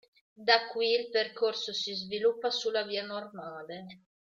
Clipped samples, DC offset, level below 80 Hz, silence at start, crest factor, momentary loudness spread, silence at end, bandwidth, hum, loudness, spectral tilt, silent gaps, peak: under 0.1%; under 0.1%; -80 dBFS; 0.4 s; 26 dB; 17 LU; 0.25 s; 7.6 kHz; none; -30 LUFS; -2.5 dB/octave; none; -6 dBFS